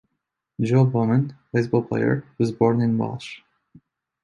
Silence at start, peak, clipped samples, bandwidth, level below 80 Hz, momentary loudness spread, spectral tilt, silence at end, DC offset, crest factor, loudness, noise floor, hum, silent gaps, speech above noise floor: 0.6 s; -4 dBFS; under 0.1%; 10.5 kHz; -58 dBFS; 15 LU; -8.5 dB/octave; 0.85 s; under 0.1%; 18 dB; -22 LUFS; -80 dBFS; none; none; 59 dB